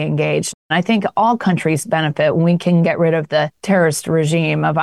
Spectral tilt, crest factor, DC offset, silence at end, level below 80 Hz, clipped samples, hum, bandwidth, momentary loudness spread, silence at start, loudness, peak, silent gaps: -6 dB/octave; 10 dB; 0.1%; 0 s; -58 dBFS; under 0.1%; none; 12.5 kHz; 4 LU; 0 s; -16 LUFS; -4 dBFS; 0.54-0.69 s